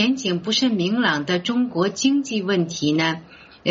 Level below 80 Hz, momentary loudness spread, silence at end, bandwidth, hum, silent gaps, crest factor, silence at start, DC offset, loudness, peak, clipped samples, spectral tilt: -62 dBFS; 4 LU; 0 s; 7.8 kHz; none; none; 16 dB; 0 s; under 0.1%; -21 LUFS; -6 dBFS; under 0.1%; -3.5 dB/octave